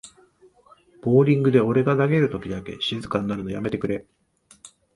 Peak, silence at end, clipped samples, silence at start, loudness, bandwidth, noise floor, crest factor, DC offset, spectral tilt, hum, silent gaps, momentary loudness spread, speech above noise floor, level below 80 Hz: -4 dBFS; 0.3 s; under 0.1%; 0.05 s; -22 LUFS; 11.5 kHz; -55 dBFS; 20 dB; under 0.1%; -7.5 dB/octave; none; none; 13 LU; 34 dB; -54 dBFS